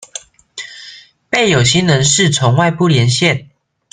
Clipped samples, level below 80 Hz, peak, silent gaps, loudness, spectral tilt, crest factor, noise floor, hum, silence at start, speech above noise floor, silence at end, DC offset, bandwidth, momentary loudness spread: under 0.1%; -46 dBFS; 0 dBFS; none; -12 LUFS; -4 dB/octave; 14 dB; -38 dBFS; none; 0.15 s; 27 dB; 0.5 s; under 0.1%; 10 kHz; 19 LU